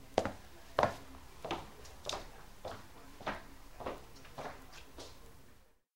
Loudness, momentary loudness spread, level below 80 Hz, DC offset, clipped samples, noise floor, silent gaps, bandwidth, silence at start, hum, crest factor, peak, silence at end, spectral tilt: -42 LUFS; 19 LU; -58 dBFS; 0.2%; under 0.1%; -63 dBFS; none; 16 kHz; 0 s; none; 32 dB; -10 dBFS; 0 s; -4 dB/octave